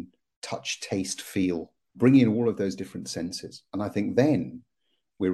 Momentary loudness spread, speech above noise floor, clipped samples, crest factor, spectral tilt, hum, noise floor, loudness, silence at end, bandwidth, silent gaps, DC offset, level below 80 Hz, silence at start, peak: 17 LU; 52 dB; under 0.1%; 18 dB; -5.5 dB/octave; none; -78 dBFS; -26 LUFS; 0 s; 12.5 kHz; 0.36-0.42 s; under 0.1%; -64 dBFS; 0 s; -8 dBFS